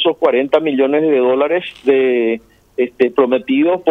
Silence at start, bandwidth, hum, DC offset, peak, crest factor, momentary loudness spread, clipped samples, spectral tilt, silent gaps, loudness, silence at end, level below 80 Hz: 0 s; 5.4 kHz; none; under 0.1%; 0 dBFS; 14 dB; 7 LU; under 0.1%; -6.5 dB/octave; none; -15 LUFS; 0 s; -60 dBFS